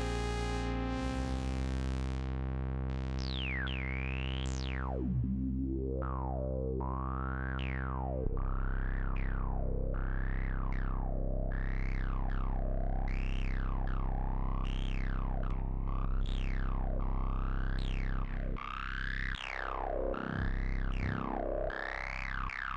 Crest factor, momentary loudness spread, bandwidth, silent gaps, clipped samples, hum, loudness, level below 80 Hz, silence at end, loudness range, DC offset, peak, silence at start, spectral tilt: 16 dB; 2 LU; 8.4 kHz; none; under 0.1%; none; -37 LUFS; -36 dBFS; 0 s; 2 LU; under 0.1%; -18 dBFS; 0 s; -6.5 dB/octave